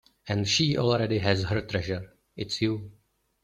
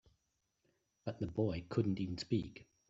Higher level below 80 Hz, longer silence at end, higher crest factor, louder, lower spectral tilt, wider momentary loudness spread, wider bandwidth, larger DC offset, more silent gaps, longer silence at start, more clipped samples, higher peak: first, -54 dBFS vs -64 dBFS; first, 0.5 s vs 0.25 s; about the same, 20 dB vs 20 dB; first, -27 LUFS vs -39 LUFS; second, -5 dB/octave vs -7.5 dB/octave; about the same, 12 LU vs 11 LU; first, 10 kHz vs 8 kHz; neither; neither; second, 0.25 s vs 1.05 s; neither; first, -8 dBFS vs -20 dBFS